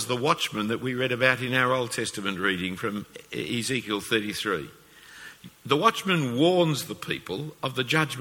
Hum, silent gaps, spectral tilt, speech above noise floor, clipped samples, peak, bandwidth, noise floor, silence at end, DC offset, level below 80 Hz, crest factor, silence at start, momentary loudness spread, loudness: none; none; -4.5 dB/octave; 21 dB; under 0.1%; -4 dBFS; 19 kHz; -47 dBFS; 0 s; under 0.1%; -62 dBFS; 22 dB; 0 s; 13 LU; -26 LUFS